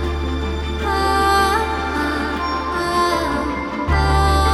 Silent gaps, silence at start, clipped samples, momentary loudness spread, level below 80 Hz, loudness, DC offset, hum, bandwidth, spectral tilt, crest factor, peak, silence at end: none; 0 s; under 0.1%; 7 LU; -24 dBFS; -19 LUFS; under 0.1%; none; 13 kHz; -5 dB/octave; 14 dB; -4 dBFS; 0 s